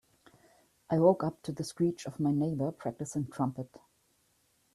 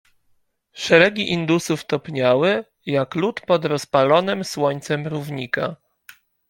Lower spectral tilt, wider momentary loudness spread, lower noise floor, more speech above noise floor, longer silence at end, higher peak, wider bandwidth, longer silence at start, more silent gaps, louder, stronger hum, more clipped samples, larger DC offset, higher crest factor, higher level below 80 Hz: first, -7.5 dB/octave vs -5 dB/octave; about the same, 12 LU vs 10 LU; first, -72 dBFS vs -64 dBFS; about the same, 41 dB vs 44 dB; first, 0.95 s vs 0.75 s; second, -12 dBFS vs -2 dBFS; second, 13.5 kHz vs 17 kHz; first, 0.9 s vs 0.75 s; neither; second, -32 LUFS vs -20 LUFS; neither; neither; neither; about the same, 22 dB vs 20 dB; second, -70 dBFS vs -62 dBFS